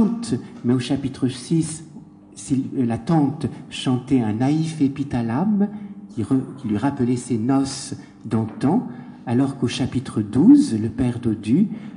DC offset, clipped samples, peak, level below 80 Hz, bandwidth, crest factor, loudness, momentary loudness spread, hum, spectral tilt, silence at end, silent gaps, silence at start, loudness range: under 0.1%; under 0.1%; -2 dBFS; -50 dBFS; 10.5 kHz; 18 dB; -21 LUFS; 9 LU; none; -6.5 dB/octave; 0 s; none; 0 s; 4 LU